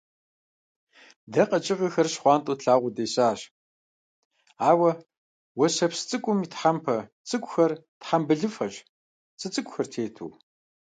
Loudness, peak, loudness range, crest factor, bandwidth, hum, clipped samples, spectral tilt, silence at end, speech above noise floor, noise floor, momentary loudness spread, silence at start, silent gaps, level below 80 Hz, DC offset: -25 LUFS; -6 dBFS; 3 LU; 20 dB; 9.4 kHz; none; under 0.1%; -5 dB/octave; 0.6 s; over 65 dB; under -90 dBFS; 14 LU; 1.3 s; 3.51-4.31 s, 5.17-5.55 s, 7.12-7.24 s, 7.88-8.01 s, 8.89-9.38 s; -74 dBFS; under 0.1%